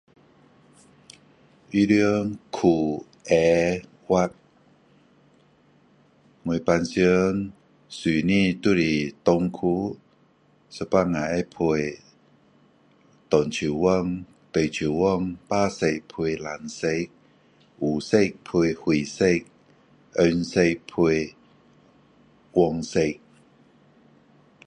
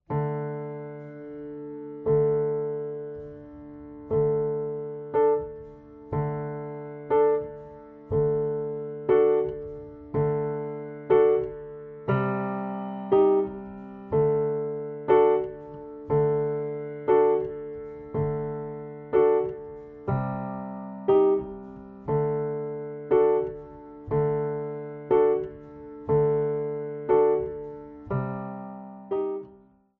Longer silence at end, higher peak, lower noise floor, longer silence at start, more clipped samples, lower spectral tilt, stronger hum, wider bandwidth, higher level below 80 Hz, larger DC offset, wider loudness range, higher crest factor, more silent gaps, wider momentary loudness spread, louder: first, 1.5 s vs 0.45 s; first, -4 dBFS vs -10 dBFS; first, -60 dBFS vs -55 dBFS; first, 1.7 s vs 0.1 s; neither; second, -6 dB/octave vs -8.5 dB/octave; neither; first, 10.5 kHz vs 3.4 kHz; about the same, -52 dBFS vs -54 dBFS; neither; about the same, 4 LU vs 4 LU; about the same, 20 dB vs 18 dB; neither; second, 11 LU vs 19 LU; about the same, -24 LUFS vs -26 LUFS